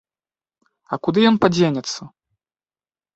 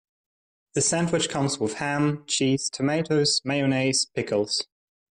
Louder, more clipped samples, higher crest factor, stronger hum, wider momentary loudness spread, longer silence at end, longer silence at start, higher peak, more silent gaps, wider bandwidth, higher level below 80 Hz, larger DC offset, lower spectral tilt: first, -18 LUFS vs -24 LUFS; neither; first, 22 dB vs 14 dB; neither; first, 14 LU vs 5 LU; first, 1.05 s vs 0.45 s; first, 0.9 s vs 0.75 s; first, 0 dBFS vs -12 dBFS; neither; second, 8 kHz vs 11.5 kHz; about the same, -58 dBFS vs -62 dBFS; neither; first, -5.5 dB/octave vs -3.5 dB/octave